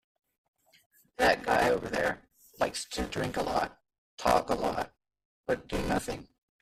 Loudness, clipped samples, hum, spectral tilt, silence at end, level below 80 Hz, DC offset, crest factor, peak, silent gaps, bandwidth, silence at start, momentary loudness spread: -30 LUFS; under 0.1%; none; -4 dB/octave; 0.4 s; -50 dBFS; under 0.1%; 22 dB; -10 dBFS; 3.98-4.18 s, 5.25-5.43 s; 15 kHz; 1.2 s; 14 LU